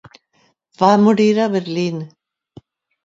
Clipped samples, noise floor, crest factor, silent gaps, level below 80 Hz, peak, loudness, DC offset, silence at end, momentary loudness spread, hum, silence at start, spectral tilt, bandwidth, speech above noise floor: under 0.1%; -61 dBFS; 18 dB; none; -64 dBFS; 0 dBFS; -16 LUFS; under 0.1%; 0.95 s; 14 LU; none; 0.8 s; -6.5 dB/octave; 7.6 kHz; 46 dB